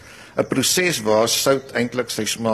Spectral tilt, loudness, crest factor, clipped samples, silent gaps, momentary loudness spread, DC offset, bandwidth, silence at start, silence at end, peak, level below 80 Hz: -3 dB/octave; -19 LUFS; 16 dB; under 0.1%; none; 6 LU; under 0.1%; 14 kHz; 0.05 s; 0 s; -4 dBFS; -56 dBFS